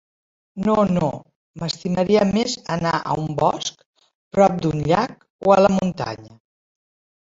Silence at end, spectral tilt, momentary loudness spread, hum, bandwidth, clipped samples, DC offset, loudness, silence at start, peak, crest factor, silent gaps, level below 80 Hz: 0.95 s; -6 dB/octave; 13 LU; none; 7.8 kHz; under 0.1%; under 0.1%; -20 LUFS; 0.55 s; -2 dBFS; 20 dB; 1.35-1.54 s, 3.86-3.93 s, 4.15-4.31 s, 5.30-5.39 s; -50 dBFS